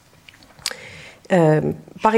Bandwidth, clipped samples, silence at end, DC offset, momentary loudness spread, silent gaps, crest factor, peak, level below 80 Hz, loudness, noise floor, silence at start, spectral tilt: 15 kHz; under 0.1%; 0 s; under 0.1%; 21 LU; none; 18 dB; -2 dBFS; -56 dBFS; -20 LUFS; -49 dBFS; 0.65 s; -6 dB/octave